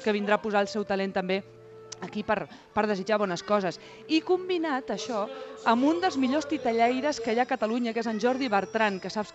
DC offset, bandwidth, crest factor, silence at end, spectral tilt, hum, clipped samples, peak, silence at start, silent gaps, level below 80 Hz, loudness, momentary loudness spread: under 0.1%; 8.4 kHz; 18 dB; 0 s; -5 dB/octave; none; under 0.1%; -10 dBFS; 0 s; none; -66 dBFS; -28 LUFS; 8 LU